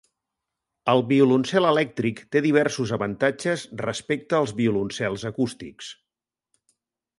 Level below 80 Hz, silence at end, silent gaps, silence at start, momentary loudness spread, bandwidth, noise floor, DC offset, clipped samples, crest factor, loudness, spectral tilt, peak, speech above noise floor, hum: -60 dBFS; 1.25 s; none; 0.85 s; 11 LU; 11.5 kHz; -89 dBFS; under 0.1%; under 0.1%; 20 dB; -23 LUFS; -5.5 dB/octave; -6 dBFS; 66 dB; none